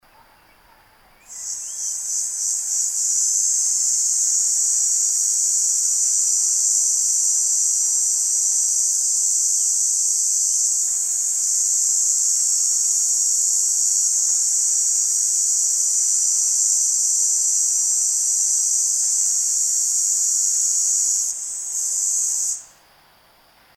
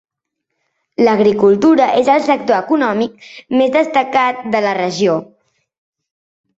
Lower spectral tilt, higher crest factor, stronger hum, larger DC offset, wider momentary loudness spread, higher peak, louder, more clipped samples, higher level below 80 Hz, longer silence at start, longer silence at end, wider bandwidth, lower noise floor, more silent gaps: second, 5 dB/octave vs -5.5 dB/octave; about the same, 16 dB vs 14 dB; neither; neither; second, 4 LU vs 7 LU; about the same, -4 dBFS vs -2 dBFS; about the same, -16 LUFS vs -14 LUFS; neither; second, -68 dBFS vs -58 dBFS; first, 1.3 s vs 1 s; second, 1.1 s vs 1.35 s; first, 17.5 kHz vs 8 kHz; second, -54 dBFS vs -76 dBFS; neither